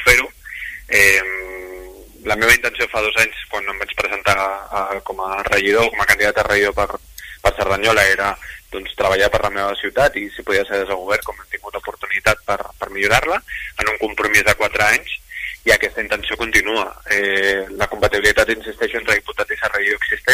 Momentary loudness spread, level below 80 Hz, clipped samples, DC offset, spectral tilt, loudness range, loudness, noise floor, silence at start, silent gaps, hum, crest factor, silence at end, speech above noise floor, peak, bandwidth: 14 LU; -38 dBFS; under 0.1%; under 0.1%; -2.5 dB/octave; 3 LU; -17 LUFS; -37 dBFS; 0 s; none; none; 18 dB; 0 s; 19 dB; 0 dBFS; 16 kHz